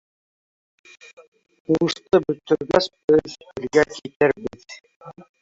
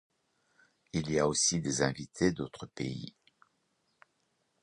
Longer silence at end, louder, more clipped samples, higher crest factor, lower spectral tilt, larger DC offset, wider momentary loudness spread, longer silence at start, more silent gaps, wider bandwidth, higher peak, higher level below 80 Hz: second, 0.2 s vs 1.55 s; first, -21 LUFS vs -32 LUFS; neither; about the same, 20 dB vs 24 dB; first, -5.5 dB/octave vs -4 dB/octave; neither; first, 19 LU vs 14 LU; first, 1.7 s vs 0.95 s; first, 3.04-3.08 s, 4.16-4.20 s, 4.96-5.00 s vs none; second, 7.8 kHz vs 11 kHz; first, -2 dBFS vs -10 dBFS; about the same, -56 dBFS vs -60 dBFS